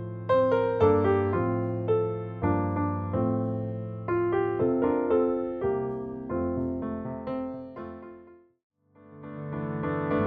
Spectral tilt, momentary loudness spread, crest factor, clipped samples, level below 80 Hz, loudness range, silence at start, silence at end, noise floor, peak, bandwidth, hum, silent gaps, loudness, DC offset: -10.5 dB/octave; 14 LU; 18 dB; under 0.1%; -56 dBFS; 10 LU; 0 s; 0 s; -52 dBFS; -10 dBFS; 4.8 kHz; none; 8.63-8.70 s; -28 LUFS; under 0.1%